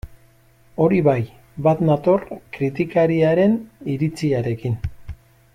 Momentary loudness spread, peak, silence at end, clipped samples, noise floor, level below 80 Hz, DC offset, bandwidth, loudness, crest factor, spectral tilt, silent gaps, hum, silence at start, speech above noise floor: 16 LU; -4 dBFS; 0.4 s; under 0.1%; -53 dBFS; -44 dBFS; under 0.1%; 13.5 kHz; -20 LUFS; 16 dB; -8.5 dB/octave; none; none; 0.05 s; 34 dB